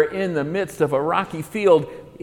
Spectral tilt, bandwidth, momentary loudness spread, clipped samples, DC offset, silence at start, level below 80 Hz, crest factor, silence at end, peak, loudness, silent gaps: -6.5 dB/octave; 18 kHz; 8 LU; under 0.1%; under 0.1%; 0 s; -56 dBFS; 18 dB; 0 s; -4 dBFS; -21 LUFS; none